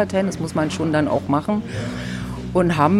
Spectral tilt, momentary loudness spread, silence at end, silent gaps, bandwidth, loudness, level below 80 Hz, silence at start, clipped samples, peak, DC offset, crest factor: -6.5 dB/octave; 8 LU; 0 s; none; 13 kHz; -22 LUFS; -42 dBFS; 0 s; under 0.1%; -4 dBFS; under 0.1%; 16 dB